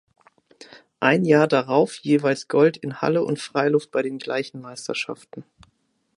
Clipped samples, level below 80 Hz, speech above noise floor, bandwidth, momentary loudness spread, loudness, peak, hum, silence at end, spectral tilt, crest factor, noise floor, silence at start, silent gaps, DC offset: under 0.1%; -70 dBFS; 46 dB; 11 kHz; 15 LU; -21 LUFS; -2 dBFS; none; 0.75 s; -6 dB/octave; 22 dB; -67 dBFS; 0.75 s; none; under 0.1%